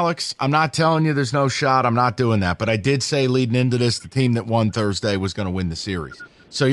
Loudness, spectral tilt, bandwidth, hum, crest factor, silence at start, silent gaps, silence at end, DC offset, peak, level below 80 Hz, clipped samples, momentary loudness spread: -20 LUFS; -5.5 dB/octave; 11.5 kHz; none; 16 dB; 0 s; none; 0 s; under 0.1%; -4 dBFS; -48 dBFS; under 0.1%; 7 LU